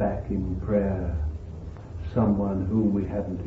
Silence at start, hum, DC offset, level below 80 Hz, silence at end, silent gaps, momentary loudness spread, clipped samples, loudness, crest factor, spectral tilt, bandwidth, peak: 0 s; none; under 0.1%; -36 dBFS; 0 s; none; 14 LU; under 0.1%; -27 LUFS; 16 dB; -11 dB/octave; 4.7 kHz; -10 dBFS